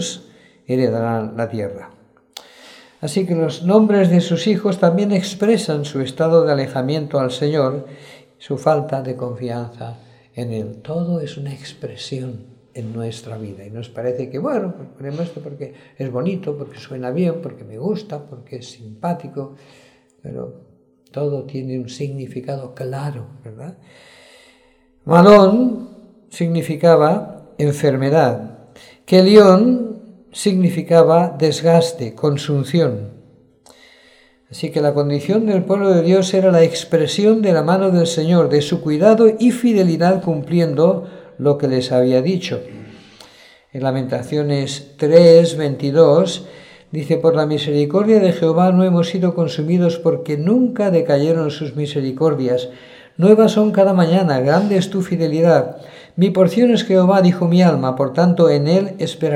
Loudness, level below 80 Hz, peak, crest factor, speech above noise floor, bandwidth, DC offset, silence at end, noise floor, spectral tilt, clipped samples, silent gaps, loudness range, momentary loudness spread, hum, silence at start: -16 LUFS; -60 dBFS; 0 dBFS; 16 dB; 39 dB; 12.5 kHz; under 0.1%; 0 s; -54 dBFS; -7 dB/octave; under 0.1%; none; 13 LU; 19 LU; none; 0 s